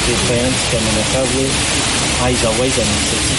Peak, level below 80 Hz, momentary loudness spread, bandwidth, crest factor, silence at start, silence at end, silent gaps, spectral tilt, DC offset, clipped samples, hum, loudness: -4 dBFS; -28 dBFS; 1 LU; 11.5 kHz; 12 dB; 0 s; 0 s; none; -3 dB/octave; under 0.1%; under 0.1%; none; -14 LUFS